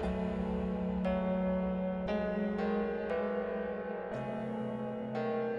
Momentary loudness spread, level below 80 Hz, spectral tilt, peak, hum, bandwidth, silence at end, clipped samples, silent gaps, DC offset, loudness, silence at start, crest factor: 5 LU; -52 dBFS; -9 dB/octave; -22 dBFS; none; 5.8 kHz; 0 s; under 0.1%; none; under 0.1%; -35 LUFS; 0 s; 12 dB